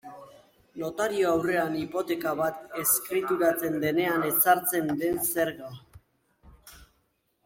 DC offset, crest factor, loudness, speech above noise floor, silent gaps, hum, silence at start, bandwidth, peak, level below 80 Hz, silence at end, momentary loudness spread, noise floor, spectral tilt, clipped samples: under 0.1%; 20 dB; -26 LUFS; 46 dB; none; none; 0.05 s; 16.5 kHz; -8 dBFS; -62 dBFS; 0.6 s; 12 LU; -72 dBFS; -4 dB/octave; under 0.1%